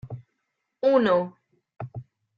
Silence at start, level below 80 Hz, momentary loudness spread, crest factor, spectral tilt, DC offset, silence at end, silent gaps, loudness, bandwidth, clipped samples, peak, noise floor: 0.05 s; -64 dBFS; 22 LU; 20 dB; -8 dB/octave; under 0.1%; 0.35 s; none; -22 LUFS; 5.6 kHz; under 0.1%; -8 dBFS; -79 dBFS